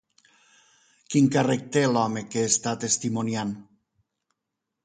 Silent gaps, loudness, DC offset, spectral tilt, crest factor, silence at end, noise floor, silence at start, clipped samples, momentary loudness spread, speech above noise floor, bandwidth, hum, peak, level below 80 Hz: none; -24 LUFS; under 0.1%; -4.5 dB/octave; 20 dB; 1.2 s; -84 dBFS; 1.1 s; under 0.1%; 8 LU; 60 dB; 9.6 kHz; none; -8 dBFS; -66 dBFS